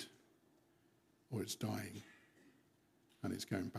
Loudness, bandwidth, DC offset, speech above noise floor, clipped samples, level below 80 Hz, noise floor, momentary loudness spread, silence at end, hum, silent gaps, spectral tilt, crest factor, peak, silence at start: -45 LUFS; 15.5 kHz; under 0.1%; 31 dB; under 0.1%; -84 dBFS; -74 dBFS; 16 LU; 0 s; none; none; -5 dB/octave; 22 dB; -26 dBFS; 0 s